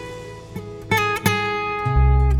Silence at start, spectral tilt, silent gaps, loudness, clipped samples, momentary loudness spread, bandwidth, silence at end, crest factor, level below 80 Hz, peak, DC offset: 0 s; -5.5 dB/octave; none; -20 LUFS; under 0.1%; 17 LU; 17.5 kHz; 0 s; 18 dB; -24 dBFS; -2 dBFS; under 0.1%